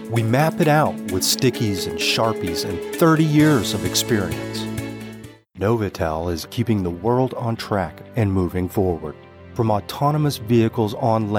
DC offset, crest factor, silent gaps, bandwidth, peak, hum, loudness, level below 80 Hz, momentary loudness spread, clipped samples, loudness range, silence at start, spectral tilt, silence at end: under 0.1%; 16 dB; none; 20 kHz; -4 dBFS; none; -20 LUFS; -46 dBFS; 10 LU; under 0.1%; 5 LU; 0 s; -5.5 dB/octave; 0 s